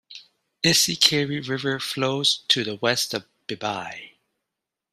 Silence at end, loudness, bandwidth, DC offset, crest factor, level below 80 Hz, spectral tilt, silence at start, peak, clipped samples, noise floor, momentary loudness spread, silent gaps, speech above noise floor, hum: 0.85 s; -22 LUFS; 15.5 kHz; under 0.1%; 24 dB; -64 dBFS; -2.5 dB/octave; 0.1 s; 0 dBFS; under 0.1%; -85 dBFS; 14 LU; none; 61 dB; none